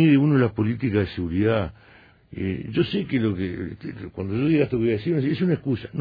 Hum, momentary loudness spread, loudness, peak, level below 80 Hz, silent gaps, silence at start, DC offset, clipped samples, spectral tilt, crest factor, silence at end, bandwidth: none; 12 LU; -24 LUFS; -8 dBFS; -48 dBFS; none; 0 s; under 0.1%; under 0.1%; -10.5 dB/octave; 16 dB; 0 s; 5 kHz